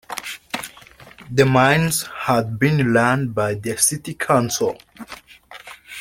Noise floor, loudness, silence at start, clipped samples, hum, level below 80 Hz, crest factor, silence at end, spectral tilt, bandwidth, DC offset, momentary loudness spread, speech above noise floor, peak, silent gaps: -45 dBFS; -19 LUFS; 0.1 s; under 0.1%; none; -52 dBFS; 18 dB; 0 s; -4.5 dB/octave; 16.5 kHz; under 0.1%; 22 LU; 26 dB; -2 dBFS; none